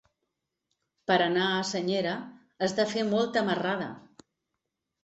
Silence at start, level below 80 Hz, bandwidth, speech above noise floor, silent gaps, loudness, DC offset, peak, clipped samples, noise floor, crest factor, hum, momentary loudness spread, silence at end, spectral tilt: 1.1 s; -72 dBFS; 8.2 kHz; 56 dB; none; -28 LUFS; under 0.1%; -10 dBFS; under 0.1%; -84 dBFS; 20 dB; none; 14 LU; 1.05 s; -4.5 dB/octave